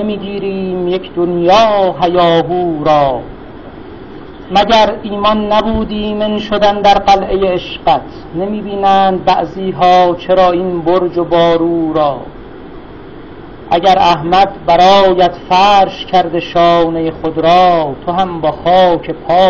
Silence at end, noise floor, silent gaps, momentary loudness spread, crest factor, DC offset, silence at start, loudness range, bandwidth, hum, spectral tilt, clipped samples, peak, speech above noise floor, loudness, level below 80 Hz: 0 s; -31 dBFS; none; 22 LU; 12 dB; under 0.1%; 0 s; 4 LU; 7.2 kHz; none; -6 dB/octave; under 0.1%; 0 dBFS; 20 dB; -11 LUFS; -34 dBFS